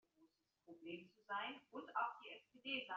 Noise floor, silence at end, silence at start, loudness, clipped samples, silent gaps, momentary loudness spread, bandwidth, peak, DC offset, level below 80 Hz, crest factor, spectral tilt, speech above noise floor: -78 dBFS; 0 s; 0.2 s; -49 LUFS; under 0.1%; none; 13 LU; 7.2 kHz; -30 dBFS; under 0.1%; under -90 dBFS; 20 dB; 0 dB/octave; 29 dB